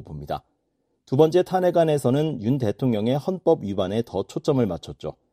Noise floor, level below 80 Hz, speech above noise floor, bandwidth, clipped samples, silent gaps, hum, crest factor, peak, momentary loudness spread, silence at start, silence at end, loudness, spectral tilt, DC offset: -73 dBFS; -54 dBFS; 50 dB; 14.5 kHz; under 0.1%; none; none; 20 dB; -4 dBFS; 13 LU; 0 s; 0.2 s; -23 LUFS; -7.5 dB/octave; under 0.1%